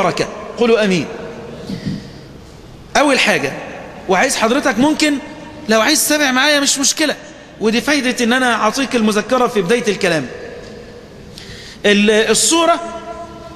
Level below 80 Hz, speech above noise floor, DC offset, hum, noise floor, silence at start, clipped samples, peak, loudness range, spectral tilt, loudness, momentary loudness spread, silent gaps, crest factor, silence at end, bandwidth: -46 dBFS; 22 dB; under 0.1%; none; -36 dBFS; 0 s; under 0.1%; 0 dBFS; 4 LU; -3 dB/octave; -14 LUFS; 19 LU; none; 16 dB; 0 s; 14.5 kHz